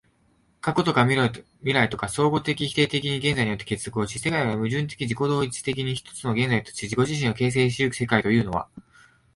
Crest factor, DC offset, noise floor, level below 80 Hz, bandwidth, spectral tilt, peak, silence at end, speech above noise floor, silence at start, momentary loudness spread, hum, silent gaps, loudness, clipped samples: 20 dB; under 0.1%; -64 dBFS; -52 dBFS; 11.5 kHz; -5 dB/octave; -6 dBFS; 0.55 s; 40 dB; 0.65 s; 8 LU; none; none; -24 LUFS; under 0.1%